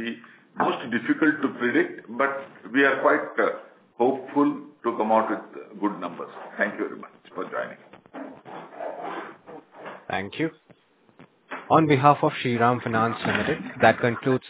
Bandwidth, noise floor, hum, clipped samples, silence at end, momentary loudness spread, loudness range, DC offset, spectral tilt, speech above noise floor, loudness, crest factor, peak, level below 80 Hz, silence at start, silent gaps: 4 kHz; -57 dBFS; none; under 0.1%; 0 s; 21 LU; 12 LU; under 0.1%; -10 dB/octave; 34 dB; -24 LUFS; 24 dB; -2 dBFS; -64 dBFS; 0 s; none